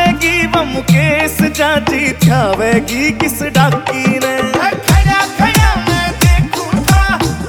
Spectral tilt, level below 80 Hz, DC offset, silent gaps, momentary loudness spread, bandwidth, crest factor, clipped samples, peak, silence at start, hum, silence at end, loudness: -5 dB/octave; -20 dBFS; under 0.1%; none; 4 LU; over 20 kHz; 12 dB; under 0.1%; 0 dBFS; 0 s; none; 0 s; -12 LUFS